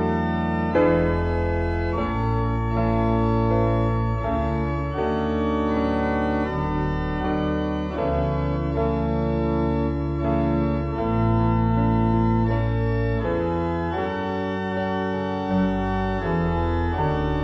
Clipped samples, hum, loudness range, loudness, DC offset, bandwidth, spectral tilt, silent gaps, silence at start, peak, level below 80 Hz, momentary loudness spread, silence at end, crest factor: under 0.1%; none; 2 LU; -23 LUFS; under 0.1%; 7.2 kHz; -9.5 dB/octave; none; 0 s; -8 dBFS; -32 dBFS; 5 LU; 0 s; 14 dB